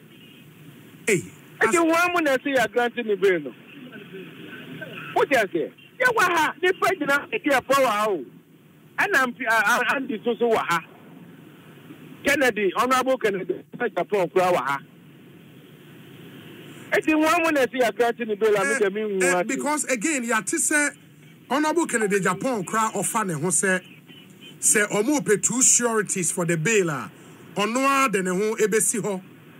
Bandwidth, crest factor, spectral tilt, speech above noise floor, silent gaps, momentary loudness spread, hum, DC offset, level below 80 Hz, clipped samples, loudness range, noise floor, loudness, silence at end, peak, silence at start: 16 kHz; 16 dB; -3 dB/octave; 30 dB; none; 13 LU; none; under 0.1%; -68 dBFS; under 0.1%; 5 LU; -52 dBFS; -22 LUFS; 0.3 s; -8 dBFS; 0.2 s